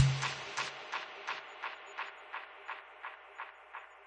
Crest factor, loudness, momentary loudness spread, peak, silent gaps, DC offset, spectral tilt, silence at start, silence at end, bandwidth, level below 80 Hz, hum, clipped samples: 26 dB; -41 LUFS; 11 LU; -12 dBFS; none; under 0.1%; -4.5 dB/octave; 0 s; 0 s; 9.6 kHz; -68 dBFS; none; under 0.1%